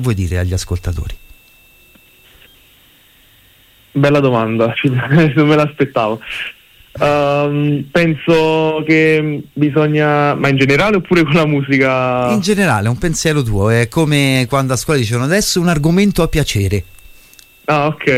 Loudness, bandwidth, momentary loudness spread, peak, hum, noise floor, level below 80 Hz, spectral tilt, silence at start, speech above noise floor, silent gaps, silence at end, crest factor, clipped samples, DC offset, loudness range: -14 LUFS; 16 kHz; 7 LU; -2 dBFS; none; -48 dBFS; -34 dBFS; -5.5 dB/octave; 0 s; 35 dB; none; 0 s; 14 dB; under 0.1%; under 0.1%; 7 LU